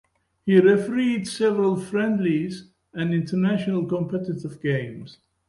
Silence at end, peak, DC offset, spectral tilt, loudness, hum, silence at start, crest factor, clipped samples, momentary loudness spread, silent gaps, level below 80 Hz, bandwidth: 0.4 s; -4 dBFS; under 0.1%; -7 dB/octave; -23 LUFS; none; 0.45 s; 18 dB; under 0.1%; 14 LU; none; -62 dBFS; 11.5 kHz